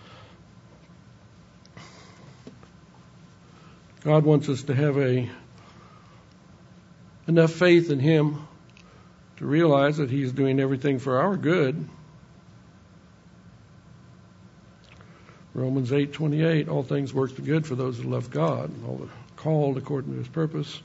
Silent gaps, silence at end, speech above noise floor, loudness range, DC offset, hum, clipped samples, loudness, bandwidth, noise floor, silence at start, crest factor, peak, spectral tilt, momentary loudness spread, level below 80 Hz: none; 0 s; 29 dB; 7 LU; under 0.1%; none; under 0.1%; -24 LUFS; 8 kHz; -52 dBFS; 0.1 s; 22 dB; -4 dBFS; -8 dB/octave; 17 LU; -64 dBFS